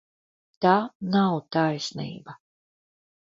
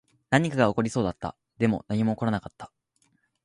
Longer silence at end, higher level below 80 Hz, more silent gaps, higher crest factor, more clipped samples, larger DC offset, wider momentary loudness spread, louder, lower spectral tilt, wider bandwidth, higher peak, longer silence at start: about the same, 0.9 s vs 0.8 s; second, -68 dBFS vs -54 dBFS; first, 0.95-1.00 s vs none; about the same, 22 dB vs 22 dB; neither; neither; about the same, 14 LU vs 16 LU; about the same, -24 LUFS vs -26 LUFS; about the same, -6 dB/octave vs -6.5 dB/octave; second, 7.8 kHz vs 11 kHz; about the same, -6 dBFS vs -6 dBFS; first, 0.6 s vs 0.3 s